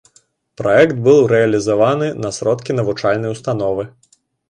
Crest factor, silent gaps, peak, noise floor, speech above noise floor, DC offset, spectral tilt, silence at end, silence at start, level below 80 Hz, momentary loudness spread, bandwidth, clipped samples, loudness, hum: 16 dB; none; 0 dBFS; -55 dBFS; 41 dB; under 0.1%; -6 dB/octave; 0.6 s; 0.6 s; -52 dBFS; 10 LU; 10.5 kHz; under 0.1%; -16 LUFS; none